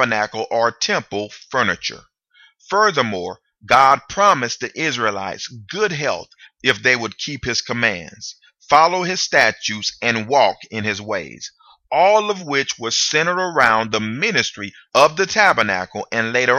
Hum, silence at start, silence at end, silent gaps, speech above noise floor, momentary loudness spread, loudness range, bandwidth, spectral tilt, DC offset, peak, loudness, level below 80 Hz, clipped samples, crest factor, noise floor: none; 0 s; 0 s; none; 36 dB; 13 LU; 4 LU; 15 kHz; -2.5 dB/octave; under 0.1%; 0 dBFS; -18 LUFS; -56 dBFS; under 0.1%; 18 dB; -54 dBFS